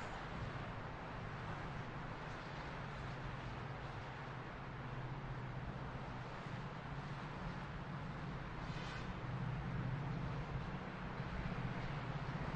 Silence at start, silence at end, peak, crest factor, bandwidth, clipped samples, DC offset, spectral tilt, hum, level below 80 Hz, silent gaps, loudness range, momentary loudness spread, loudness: 0 s; 0 s; -30 dBFS; 14 dB; 8.8 kHz; under 0.1%; under 0.1%; -7 dB/octave; none; -54 dBFS; none; 3 LU; 4 LU; -46 LUFS